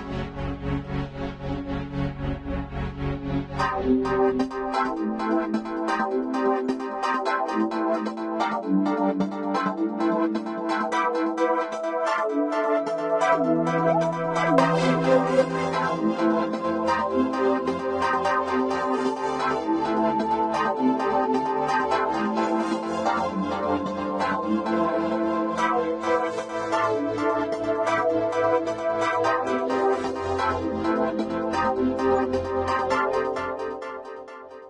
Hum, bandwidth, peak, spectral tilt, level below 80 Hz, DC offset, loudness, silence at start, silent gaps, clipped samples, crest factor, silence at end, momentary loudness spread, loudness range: none; 10.5 kHz; -4 dBFS; -6.5 dB/octave; -46 dBFS; under 0.1%; -25 LUFS; 0 s; none; under 0.1%; 20 dB; 0 s; 7 LU; 3 LU